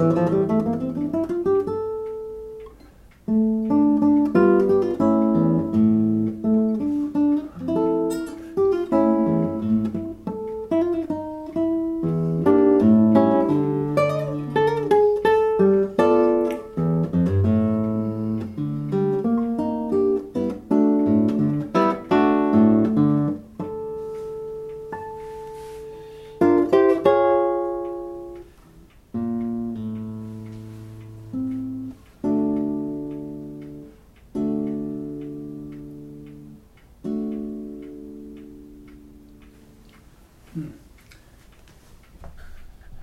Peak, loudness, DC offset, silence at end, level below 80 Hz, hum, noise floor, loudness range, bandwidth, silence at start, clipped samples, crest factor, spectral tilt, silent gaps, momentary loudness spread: -4 dBFS; -21 LUFS; under 0.1%; 0 s; -52 dBFS; none; -50 dBFS; 13 LU; 11.5 kHz; 0 s; under 0.1%; 18 dB; -9 dB/octave; none; 20 LU